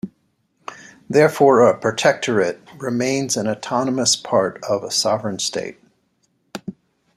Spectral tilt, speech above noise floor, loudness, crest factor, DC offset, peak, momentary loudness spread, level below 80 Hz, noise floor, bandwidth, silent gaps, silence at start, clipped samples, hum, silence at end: -3.5 dB/octave; 48 dB; -18 LUFS; 18 dB; under 0.1%; -2 dBFS; 22 LU; -64 dBFS; -66 dBFS; 14.5 kHz; none; 0.05 s; under 0.1%; none; 0.45 s